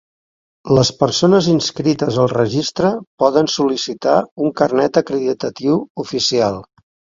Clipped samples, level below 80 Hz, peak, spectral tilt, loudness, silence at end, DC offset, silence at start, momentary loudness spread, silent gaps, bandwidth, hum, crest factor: under 0.1%; -50 dBFS; 0 dBFS; -5 dB/octave; -16 LUFS; 0.55 s; under 0.1%; 0.65 s; 6 LU; 3.07-3.18 s, 4.32-4.36 s, 5.90-5.95 s; 7.6 kHz; none; 16 dB